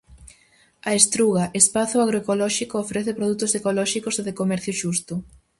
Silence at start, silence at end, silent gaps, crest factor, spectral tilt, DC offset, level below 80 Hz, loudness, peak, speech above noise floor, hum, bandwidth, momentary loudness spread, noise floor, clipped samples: 0.1 s; 0.35 s; none; 22 dB; -3.5 dB/octave; under 0.1%; -56 dBFS; -21 LUFS; 0 dBFS; 36 dB; none; 12 kHz; 10 LU; -58 dBFS; under 0.1%